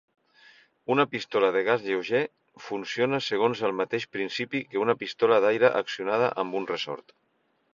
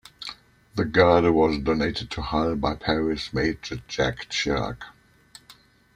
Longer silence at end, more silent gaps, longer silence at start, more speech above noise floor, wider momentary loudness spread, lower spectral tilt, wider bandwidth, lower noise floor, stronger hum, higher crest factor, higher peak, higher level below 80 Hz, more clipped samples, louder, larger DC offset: first, 0.75 s vs 0.45 s; neither; first, 0.9 s vs 0.2 s; about the same, 31 dB vs 31 dB; second, 12 LU vs 17 LU; about the same, -5 dB/octave vs -5.5 dB/octave; second, 7.4 kHz vs 14 kHz; about the same, -57 dBFS vs -54 dBFS; neither; about the same, 22 dB vs 22 dB; about the same, -4 dBFS vs -4 dBFS; second, -72 dBFS vs -42 dBFS; neither; about the same, -26 LUFS vs -24 LUFS; neither